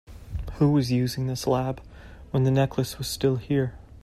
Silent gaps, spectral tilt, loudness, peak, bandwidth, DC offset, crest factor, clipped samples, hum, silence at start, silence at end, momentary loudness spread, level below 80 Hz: none; -6.5 dB/octave; -25 LUFS; -8 dBFS; 15 kHz; under 0.1%; 16 dB; under 0.1%; none; 0.1 s; 0.05 s; 13 LU; -44 dBFS